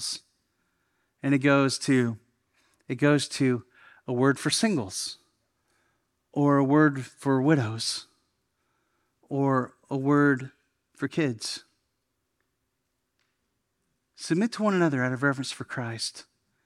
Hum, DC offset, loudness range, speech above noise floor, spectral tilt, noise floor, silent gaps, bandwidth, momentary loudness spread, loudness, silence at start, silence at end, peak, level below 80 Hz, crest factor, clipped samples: none; under 0.1%; 8 LU; 54 dB; -5 dB/octave; -79 dBFS; none; 13 kHz; 13 LU; -26 LUFS; 0 s; 0.45 s; -8 dBFS; -76 dBFS; 20 dB; under 0.1%